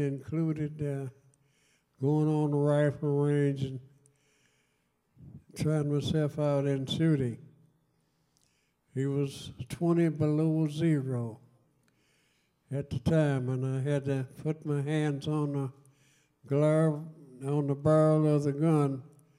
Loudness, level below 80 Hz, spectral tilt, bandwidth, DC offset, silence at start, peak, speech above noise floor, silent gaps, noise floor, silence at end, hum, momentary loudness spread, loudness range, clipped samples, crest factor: -30 LUFS; -64 dBFS; -8 dB/octave; 11.5 kHz; under 0.1%; 0 s; -14 dBFS; 46 dB; none; -75 dBFS; 0.3 s; none; 12 LU; 4 LU; under 0.1%; 16 dB